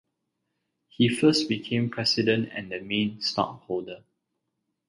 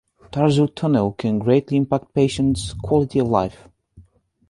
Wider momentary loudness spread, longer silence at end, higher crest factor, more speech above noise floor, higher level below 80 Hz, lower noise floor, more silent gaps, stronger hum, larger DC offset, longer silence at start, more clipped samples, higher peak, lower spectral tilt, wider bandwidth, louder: first, 12 LU vs 4 LU; first, 0.9 s vs 0.5 s; about the same, 20 dB vs 18 dB; first, 54 dB vs 34 dB; second, -64 dBFS vs -44 dBFS; first, -80 dBFS vs -53 dBFS; neither; neither; neither; first, 1 s vs 0.35 s; neither; second, -8 dBFS vs -2 dBFS; second, -5 dB/octave vs -7 dB/octave; about the same, 11.5 kHz vs 11.5 kHz; second, -26 LUFS vs -20 LUFS